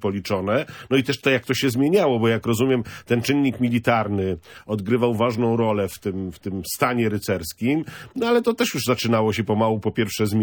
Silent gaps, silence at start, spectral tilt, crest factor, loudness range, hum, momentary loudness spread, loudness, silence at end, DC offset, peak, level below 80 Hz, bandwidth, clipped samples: none; 0 s; -5.5 dB/octave; 18 dB; 3 LU; none; 8 LU; -22 LUFS; 0 s; under 0.1%; -4 dBFS; -54 dBFS; 19 kHz; under 0.1%